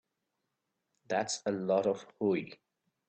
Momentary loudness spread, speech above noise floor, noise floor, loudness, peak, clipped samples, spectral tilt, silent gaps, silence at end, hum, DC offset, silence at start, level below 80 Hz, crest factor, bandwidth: 6 LU; 52 dB; -84 dBFS; -33 LUFS; -16 dBFS; under 0.1%; -4.5 dB/octave; none; 0.55 s; none; under 0.1%; 1.1 s; -80 dBFS; 18 dB; 9 kHz